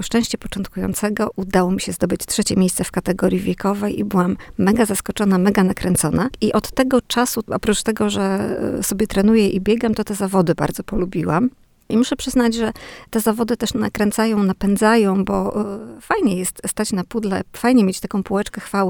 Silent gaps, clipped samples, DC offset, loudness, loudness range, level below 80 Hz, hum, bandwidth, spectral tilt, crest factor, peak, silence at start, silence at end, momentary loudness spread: none; under 0.1%; under 0.1%; -19 LUFS; 2 LU; -40 dBFS; none; 20 kHz; -5 dB/octave; 18 dB; -2 dBFS; 0 s; 0 s; 7 LU